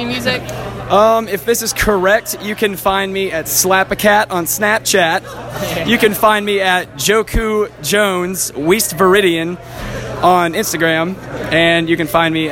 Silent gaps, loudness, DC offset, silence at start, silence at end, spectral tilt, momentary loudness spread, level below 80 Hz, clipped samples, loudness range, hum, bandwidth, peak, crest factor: none; -14 LUFS; under 0.1%; 0 s; 0 s; -3.5 dB/octave; 9 LU; -34 dBFS; under 0.1%; 1 LU; none; 17 kHz; 0 dBFS; 14 dB